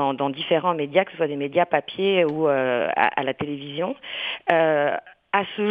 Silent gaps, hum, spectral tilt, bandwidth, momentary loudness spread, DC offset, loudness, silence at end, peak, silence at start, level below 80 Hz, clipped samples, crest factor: none; none; -8 dB/octave; 5 kHz; 8 LU; under 0.1%; -23 LUFS; 0 s; 0 dBFS; 0 s; -66 dBFS; under 0.1%; 22 dB